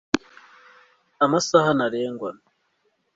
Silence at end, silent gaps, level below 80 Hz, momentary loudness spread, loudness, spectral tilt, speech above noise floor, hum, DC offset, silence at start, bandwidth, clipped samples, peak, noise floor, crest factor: 0.85 s; none; -60 dBFS; 13 LU; -22 LUFS; -4.5 dB/octave; 49 dB; none; under 0.1%; 0.15 s; 8 kHz; under 0.1%; -2 dBFS; -70 dBFS; 22 dB